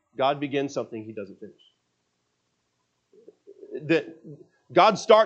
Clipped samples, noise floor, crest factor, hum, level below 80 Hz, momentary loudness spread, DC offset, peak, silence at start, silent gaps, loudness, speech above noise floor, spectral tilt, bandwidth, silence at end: under 0.1%; -75 dBFS; 24 dB; 60 Hz at -75 dBFS; -82 dBFS; 22 LU; under 0.1%; -2 dBFS; 0.2 s; none; -24 LUFS; 51 dB; -5 dB/octave; 8.4 kHz; 0 s